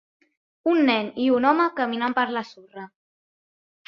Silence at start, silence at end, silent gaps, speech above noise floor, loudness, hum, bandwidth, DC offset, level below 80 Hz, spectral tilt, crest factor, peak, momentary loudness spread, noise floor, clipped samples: 0.65 s; 1 s; none; over 68 dB; -22 LUFS; none; 6.6 kHz; under 0.1%; -72 dBFS; -6 dB/octave; 20 dB; -4 dBFS; 21 LU; under -90 dBFS; under 0.1%